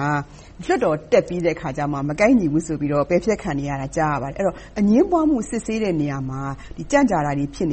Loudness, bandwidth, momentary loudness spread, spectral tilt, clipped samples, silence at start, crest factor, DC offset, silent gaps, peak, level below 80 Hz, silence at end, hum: -21 LUFS; 8.8 kHz; 9 LU; -6.5 dB/octave; under 0.1%; 0 s; 16 dB; under 0.1%; none; -4 dBFS; -42 dBFS; 0 s; none